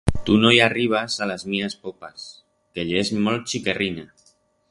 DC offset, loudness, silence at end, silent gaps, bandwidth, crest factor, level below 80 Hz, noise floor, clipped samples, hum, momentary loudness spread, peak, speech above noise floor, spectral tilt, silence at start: under 0.1%; -21 LUFS; 0.65 s; none; 11.5 kHz; 22 dB; -40 dBFS; -61 dBFS; under 0.1%; none; 21 LU; 0 dBFS; 39 dB; -4.5 dB/octave; 0.05 s